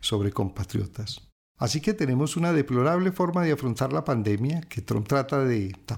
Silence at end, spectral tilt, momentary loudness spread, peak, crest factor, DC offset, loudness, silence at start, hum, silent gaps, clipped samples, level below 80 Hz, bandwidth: 0 s; -6 dB/octave; 8 LU; -12 dBFS; 14 dB; under 0.1%; -26 LUFS; 0 s; none; 1.32-1.55 s; under 0.1%; -52 dBFS; 17.5 kHz